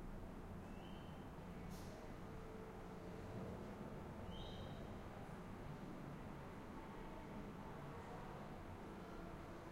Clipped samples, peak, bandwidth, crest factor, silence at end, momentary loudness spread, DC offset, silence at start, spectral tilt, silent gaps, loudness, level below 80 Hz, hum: under 0.1%; -38 dBFS; 16 kHz; 14 dB; 0 s; 2 LU; under 0.1%; 0 s; -6.5 dB/octave; none; -54 LUFS; -60 dBFS; none